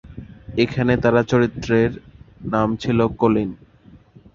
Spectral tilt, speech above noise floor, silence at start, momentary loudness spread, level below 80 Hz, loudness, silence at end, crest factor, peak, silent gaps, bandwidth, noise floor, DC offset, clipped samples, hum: -7.5 dB/octave; 30 dB; 0.05 s; 16 LU; -44 dBFS; -20 LUFS; 0.4 s; 18 dB; -2 dBFS; none; 7.4 kHz; -49 dBFS; under 0.1%; under 0.1%; none